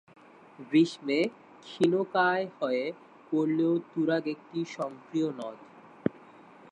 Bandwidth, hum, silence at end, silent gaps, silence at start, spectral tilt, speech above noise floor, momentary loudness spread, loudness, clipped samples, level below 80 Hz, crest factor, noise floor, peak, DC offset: 9.8 kHz; none; 0.55 s; none; 0.6 s; -6.5 dB/octave; 24 dB; 13 LU; -29 LUFS; under 0.1%; -76 dBFS; 22 dB; -53 dBFS; -10 dBFS; under 0.1%